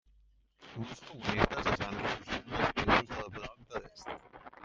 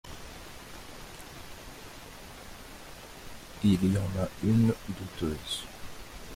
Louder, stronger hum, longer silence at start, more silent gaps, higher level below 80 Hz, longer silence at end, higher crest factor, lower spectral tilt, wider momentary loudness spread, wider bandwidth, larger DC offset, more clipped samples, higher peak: second, -34 LUFS vs -29 LUFS; neither; first, 0.6 s vs 0.05 s; neither; about the same, -50 dBFS vs -50 dBFS; about the same, 0 s vs 0 s; first, 28 dB vs 18 dB; about the same, -5 dB/octave vs -6 dB/octave; second, 17 LU vs 20 LU; second, 7.8 kHz vs 16.5 kHz; neither; neither; first, -8 dBFS vs -14 dBFS